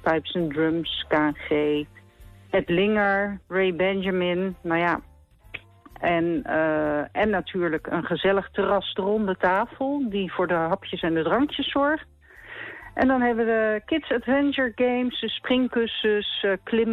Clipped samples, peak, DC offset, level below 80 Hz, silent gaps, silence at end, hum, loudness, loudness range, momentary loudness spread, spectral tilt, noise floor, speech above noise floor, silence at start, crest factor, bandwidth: under 0.1%; -10 dBFS; under 0.1%; -52 dBFS; none; 0 s; none; -24 LUFS; 2 LU; 6 LU; -7.5 dB/octave; -49 dBFS; 25 dB; 0.05 s; 14 dB; 6 kHz